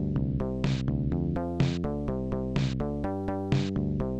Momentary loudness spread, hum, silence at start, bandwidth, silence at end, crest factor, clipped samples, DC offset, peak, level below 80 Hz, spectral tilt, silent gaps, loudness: 3 LU; none; 0 s; 8.4 kHz; 0 s; 14 dB; under 0.1%; 0.2%; -14 dBFS; -40 dBFS; -8 dB/octave; none; -30 LUFS